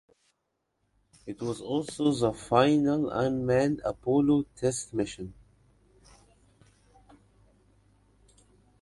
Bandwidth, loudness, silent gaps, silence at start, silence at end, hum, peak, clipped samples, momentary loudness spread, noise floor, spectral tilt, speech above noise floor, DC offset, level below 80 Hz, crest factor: 11.5 kHz; -27 LUFS; none; 1.25 s; 3.5 s; none; -8 dBFS; under 0.1%; 13 LU; -79 dBFS; -6 dB/octave; 53 dB; under 0.1%; -58 dBFS; 24 dB